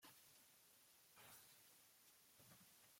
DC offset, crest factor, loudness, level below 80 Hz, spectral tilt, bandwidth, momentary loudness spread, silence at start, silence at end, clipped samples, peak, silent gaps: under 0.1%; 18 dB; -67 LUFS; under -90 dBFS; -1.5 dB/octave; 16.5 kHz; 6 LU; 0 s; 0 s; under 0.1%; -52 dBFS; none